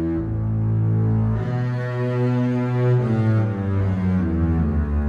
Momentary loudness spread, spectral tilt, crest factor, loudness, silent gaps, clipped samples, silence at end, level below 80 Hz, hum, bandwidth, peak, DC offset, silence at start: 4 LU; -10 dB/octave; 10 dB; -21 LUFS; none; under 0.1%; 0 s; -32 dBFS; none; 5 kHz; -10 dBFS; under 0.1%; 0 s